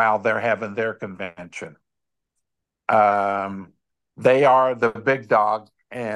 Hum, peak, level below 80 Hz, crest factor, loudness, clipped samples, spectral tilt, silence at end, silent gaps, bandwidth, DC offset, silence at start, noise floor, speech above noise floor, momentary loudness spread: none; -4 dBFS; -64 dBFS; 18 dB; -20 LUFS; under 0.1%; -6 dB/octave; 0 s; none; 11 kHz; under 0.1%; 0 s; -84 dBFS; 64 dB; 19 LU